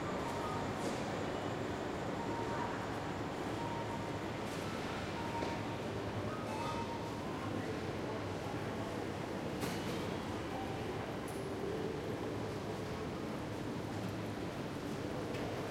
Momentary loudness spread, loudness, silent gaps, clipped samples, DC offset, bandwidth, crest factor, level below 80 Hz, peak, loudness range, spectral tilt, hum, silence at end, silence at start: 3 LU; -40 LUFS; none; under 0.1%; under 0.1%; 16.5 kHz; 16 dB; -60 dBFS; -24 dBFS; 2 LU; -5.5 dB/octave; none; 0 s; 0 s